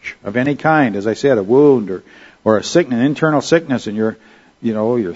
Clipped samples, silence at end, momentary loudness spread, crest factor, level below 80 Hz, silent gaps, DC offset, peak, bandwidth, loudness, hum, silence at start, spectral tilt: under 0.1%; 0 s; 10 LU; 16 dB; -56 dBFS; none; under 0.1%; 0 dBFS; 8 kHz; -15 LUFS; none; 0.05 s; -6 dB/octave